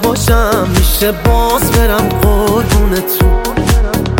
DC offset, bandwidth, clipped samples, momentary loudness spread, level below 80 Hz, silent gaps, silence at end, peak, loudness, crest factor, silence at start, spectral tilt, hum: under 0.1%; 17.5 kHz; under 0.1%; 2 LU; -14 dBFS; none; 0 s; 0 dBFS; -12 LUFS; 10 dB; 0 s; -5 dB/octave; none